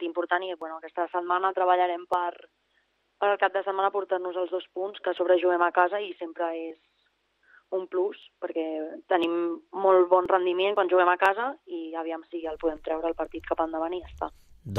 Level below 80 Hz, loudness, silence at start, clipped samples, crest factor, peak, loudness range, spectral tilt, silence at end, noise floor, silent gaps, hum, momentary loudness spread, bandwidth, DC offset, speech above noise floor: -60 dBFS; -27 LUFS; 0 s; under 0.1%; 20 dB; -8 dBFS; 7 LU; -6.5 dB/octave; 0 s; -71 dBFS; none; 50 Hz at -90 dBFS; 13 LU; 5.4 kHz; under 0.1%; 45 dB